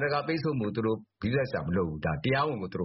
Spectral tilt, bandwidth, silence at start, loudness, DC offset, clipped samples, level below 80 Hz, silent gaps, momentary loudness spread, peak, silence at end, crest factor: -5.5 dB/octave; 5.8 kHz; 0 s; -30 LUFS; under 0.1%; under 0.1%; -52 dBFS; none; 3 LU; -16 dBFS; 0 s; 14 dB